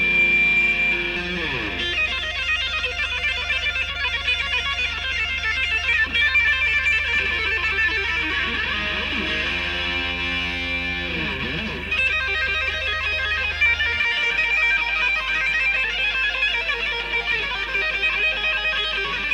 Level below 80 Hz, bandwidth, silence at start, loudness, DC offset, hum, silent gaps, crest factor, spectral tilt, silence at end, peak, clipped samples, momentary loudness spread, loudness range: -38 dBFS; 16 kHz; 0 s; -20 LUFS; under 0.1%; none; none; 14 dB; -3 dB/octave; 0 s; -8 dBFS; under 0.1%; 6 LU; 3 LU